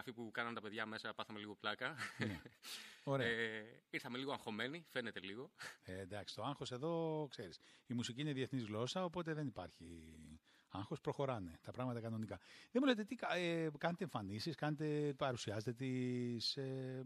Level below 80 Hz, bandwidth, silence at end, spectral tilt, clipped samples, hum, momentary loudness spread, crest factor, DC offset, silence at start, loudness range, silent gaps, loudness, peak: -76 dBFS; 14 kHz; 0 s; -5.5 dB/octave; under 0.1%; none; 12 LU; 22 dB; under 0.1%; 0 s; 5 LU; none; -44 LUFS; -22 dBFS